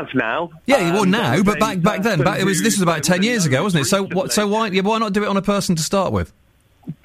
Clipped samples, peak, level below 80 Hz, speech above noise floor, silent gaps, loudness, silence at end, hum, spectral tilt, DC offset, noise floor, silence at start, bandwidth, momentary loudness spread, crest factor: under 0.1%; -4 dBFS; -46 dBFS; 21 dB; none; -18 LUFS; 0.1 s; none; -4.5 dB/octave; under 0.1%; -39 dBFS; 0 s; 16 kHz; 4 LU; 14 dB